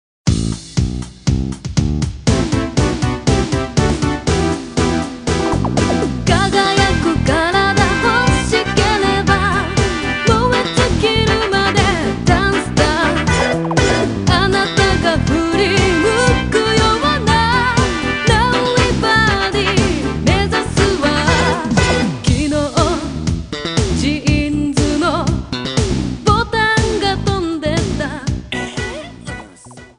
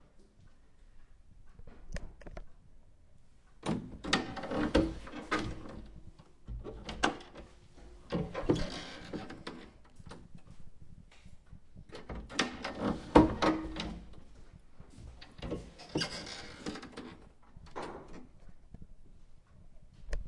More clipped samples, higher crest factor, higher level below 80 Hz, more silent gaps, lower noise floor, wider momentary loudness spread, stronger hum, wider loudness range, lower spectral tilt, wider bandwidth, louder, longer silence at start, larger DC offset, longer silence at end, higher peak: neither; second, 16 dB vs 34 dB; first, -26 dBFS vs -48 dBFS; neither; second, -38 dBFS vs -58 dBFS; second, 7 LU vs 26 LU; neither; second, 4 LU vs 17 LU; about the same, -5 dB/octave vs -5 dB/octave; about the same, 10.5 kHz vs 11.5 kHz; first, -15 LUFS vs -36 LUFS; first, 0.25 s vs 0 s; neither; first, 0.15 s vs 0 s; first, 0 dBFS vs -4 dBFS